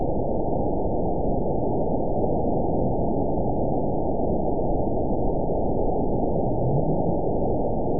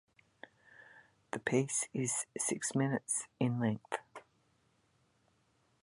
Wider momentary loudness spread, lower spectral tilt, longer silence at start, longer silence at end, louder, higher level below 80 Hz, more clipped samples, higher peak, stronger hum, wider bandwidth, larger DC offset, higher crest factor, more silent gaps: second, 2 LU vs 12 LU; first, -18.5 dB/octave vs -4.5 dB/octave; second, 0 s vs 0.95 s; second, 0 s vs 1.6 s; first, -25 LUFS vs -35 LUFS; first, -32 dBFS vs -76 dBFS; neither; first, -10 dBFS vs -16 dBFS; neither; second, 1 kHz vs 11.5 kHz; first, 5% vs under 0.1%; second, 14 dB vs 22 dB; neither